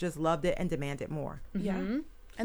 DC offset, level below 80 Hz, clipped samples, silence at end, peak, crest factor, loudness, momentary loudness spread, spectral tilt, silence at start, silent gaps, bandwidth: under 0.1%; -46 dBFS; under 0.1%; 0 s; -16 dBFS; 16 dB; -34 LUFS; 8 LU; -6.5 dB/octave; 0 s; none; over 20 kHz